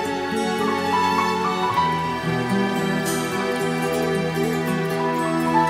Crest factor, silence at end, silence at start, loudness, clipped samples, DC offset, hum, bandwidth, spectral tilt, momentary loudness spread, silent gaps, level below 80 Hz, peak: 16 dB; 0 s; 0 s; -22 LUFS; under 0.1%; under 0.1%; none; 16 kHz; -5 dB/octave; 3 LU; none; -52 dBFS; -6 dBFS